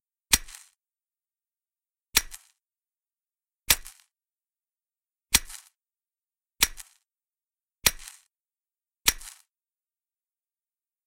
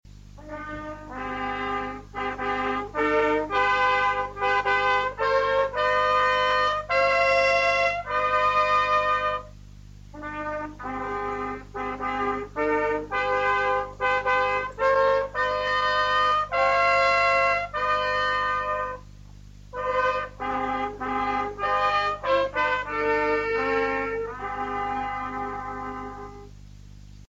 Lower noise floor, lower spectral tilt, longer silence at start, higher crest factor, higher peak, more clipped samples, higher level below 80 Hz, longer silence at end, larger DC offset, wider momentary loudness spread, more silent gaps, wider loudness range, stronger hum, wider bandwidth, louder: first, under -90 dBFS vs -45 dBFS; second, 0.5 dB/octave vs -4 dB/octave; about the same, 0.3 s vs 0.3 s; first, 32 dB vs 14 dB; first, -2 dBFS vs -10 dBFS; neither; about the same, -50 dBFS vs -48 dBFS; first, 1.8 s vs 0.05 s; neither; first, 22 LU vs 13 LU; neither; second, 2 LU vs 7 LU; second, none vs 50 Hz at -45 dBFS; first, 16.5 kHz vs 8 kHz; about the same, -25 LUFS vs -24 LUFS